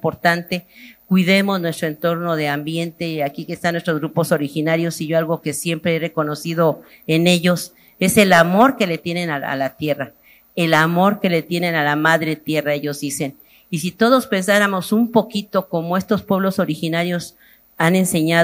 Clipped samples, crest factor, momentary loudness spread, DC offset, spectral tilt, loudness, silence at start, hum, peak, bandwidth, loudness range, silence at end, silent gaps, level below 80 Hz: under 0.1%; 18 dB; 10 LU; under 0.1%; -5 dB/octave; -18 LUFS; 0.05 s; none; 0 dBFS; 16 kHz; 4 LU; 0 s; none; -60 dBFS